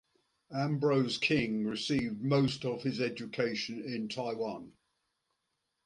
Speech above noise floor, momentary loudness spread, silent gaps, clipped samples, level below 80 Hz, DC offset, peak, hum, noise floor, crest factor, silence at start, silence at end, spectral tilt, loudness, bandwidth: 50 dB; 8 LU; none; under 0.1%; -66 dBFS; under 0.1%; -16 dBFS; none; -83 dBFS; 18 dB; 0.5 s; 1.15 s; -6 dB/octave; -33 LUFS; 11 kHz